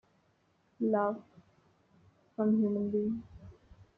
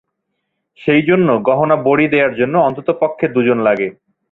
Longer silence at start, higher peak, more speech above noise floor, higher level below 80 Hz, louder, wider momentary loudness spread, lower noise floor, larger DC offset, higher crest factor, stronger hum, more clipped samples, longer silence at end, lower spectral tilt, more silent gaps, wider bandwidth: about the same, 0.8 s vs 0.8 s; second, -18 dBFS vs 0 dBFS; second, 41 dB vs 59 dB; second, -66 dBFS vs -56 dBFS; second, -32 LUFS vs -14 LUFS; first, 16 LU vs 5 LU; about the same, -72 dBFS vs -72 dBFS; neither; about the same, 16 dB vs 14 dB; neither; neither; about the same, 0.45 s vs 0.4 s; first, -11 dB/octave vs -9.5 dB/octave; neither; second, 3 kHz vs 4.1 kHz